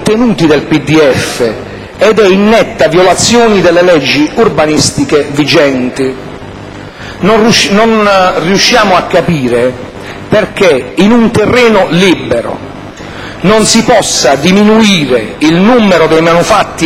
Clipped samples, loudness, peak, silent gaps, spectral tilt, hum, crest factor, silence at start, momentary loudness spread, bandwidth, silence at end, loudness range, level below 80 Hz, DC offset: 2%; -7 LUFS; 0 dBFS; none; -4.5 dB/octave; none; 8 dB; 0 s; 17 LU; 16 kHz; 0 s; 2 LU; -34 dBFS; under 0.1%